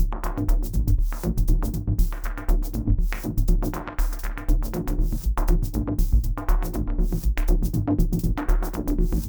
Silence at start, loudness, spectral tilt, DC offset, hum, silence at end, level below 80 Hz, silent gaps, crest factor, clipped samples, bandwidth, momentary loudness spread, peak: 0 s; -26 LUFS; -7 dB/octave; 0.2%; none; 0 s; -22 dBFS; none; 14 dB; under 0.1%; over 20 kHz; 4 LU; -8 dBFS